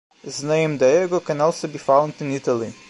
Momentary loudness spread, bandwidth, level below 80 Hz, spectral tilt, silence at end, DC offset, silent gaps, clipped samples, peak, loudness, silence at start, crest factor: 9 LU; 11.5 kHz; -68 dBFS; -5.5 dB/octave; 0.15 s; under 0.1%; none; under 0.1%; -4 dBFS; -20 LUFS; 0.25 s; 18 dB